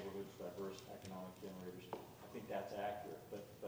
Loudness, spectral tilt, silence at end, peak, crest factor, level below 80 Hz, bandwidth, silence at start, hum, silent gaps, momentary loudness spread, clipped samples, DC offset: -50 LUFS; -5.5 dB/octave; 0 s; -32 dBFS; 18 dB; -76 dBFS; over 20 kHz; 0 s; none; none; 7 LU; under 0.1%; under 0.1%